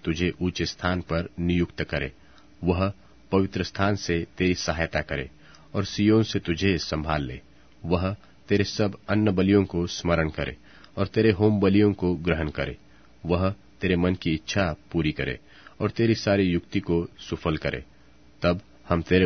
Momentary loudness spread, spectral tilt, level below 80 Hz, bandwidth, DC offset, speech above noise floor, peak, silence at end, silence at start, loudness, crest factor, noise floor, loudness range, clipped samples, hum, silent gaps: 11 LU; -6.5 dB/octave; -44 dBFS; 6.6 kHz; 0.2%; 28 dB; -4 dBFS; 0 s; 0.05 s; -26 LUFS; 20 dB; -52 dBFS; 3 LU; under 0.1%; none; none